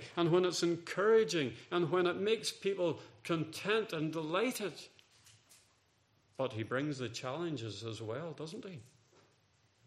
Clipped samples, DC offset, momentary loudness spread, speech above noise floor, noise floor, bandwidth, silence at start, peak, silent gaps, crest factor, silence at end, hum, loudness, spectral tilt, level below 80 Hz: under 0.1%; under 0.1%; 15 LU; 38 dB; -73 dBFS; 15 kHz; 0 s; -18 dBFS; none; 18 dB; 1.05 s; none; -35 LUFS; -5 dB/octave; -80 dBFS